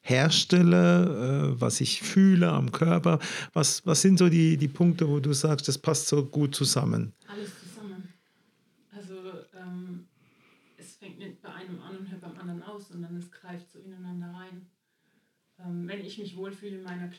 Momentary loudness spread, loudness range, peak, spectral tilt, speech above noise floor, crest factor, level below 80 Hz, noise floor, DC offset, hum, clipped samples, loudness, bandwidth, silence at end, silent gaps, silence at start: 24 LU; 21 LU; -8 dBFS; -5 dB/octave; 47 dB; 18 dB; -74 dBFS; -72 dBFS; under 0.1%; none; under 0.1%; -24 LUFS; 14.5 kHz; 0.05 s; none; 0.05 s